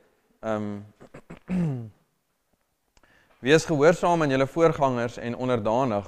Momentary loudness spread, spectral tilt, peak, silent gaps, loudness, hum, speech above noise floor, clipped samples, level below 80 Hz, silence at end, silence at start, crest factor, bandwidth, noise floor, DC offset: 16 LU; -6 dB/octave; -6 dBFS; none; -24 LUFS; none; 50 dB; under 0.1%; -52 dBFS; 0 s; 0.45 s; 20 dB; 13 kHz; -73 dBFS; under 0.1%